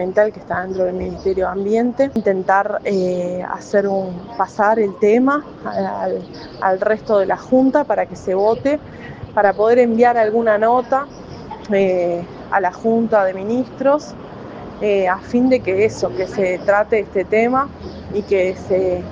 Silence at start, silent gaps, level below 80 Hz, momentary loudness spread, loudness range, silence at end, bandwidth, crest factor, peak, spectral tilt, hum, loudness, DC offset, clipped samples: 0 s; none; -48 dBFS; 11 LU; 3 LU; 0 s; 7.6 kHz; 18 dB; 0 dBFS; -7 dB/octave; none; -18 LUFS; under 0.1%; under 0.1%